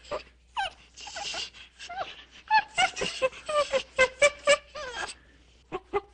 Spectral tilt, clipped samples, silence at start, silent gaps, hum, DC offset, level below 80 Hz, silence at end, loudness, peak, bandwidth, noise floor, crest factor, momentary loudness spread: -1 dB/octave; under 0.1%; 0.05 s; none; none; under 0.1%; -58 dBFS; 0.1 s; -28 LUFS; -8 dBFS; 10 kHz; -58 dBFS; 22 dB; 18 LU